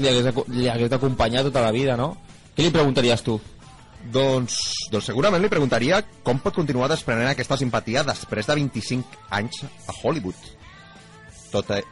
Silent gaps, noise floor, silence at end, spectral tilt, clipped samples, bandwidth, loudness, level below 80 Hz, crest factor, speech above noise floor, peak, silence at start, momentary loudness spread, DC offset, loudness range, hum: none; -46 dBFS; 0 s; -5 dB/octave; under 0.1%; 11.5 kHz; -22 LUFS; -46 dBFS; 14 dB; 24 dB; -8 dBFS; 0 s; 10 LU; under 0.1%; 6 LU; none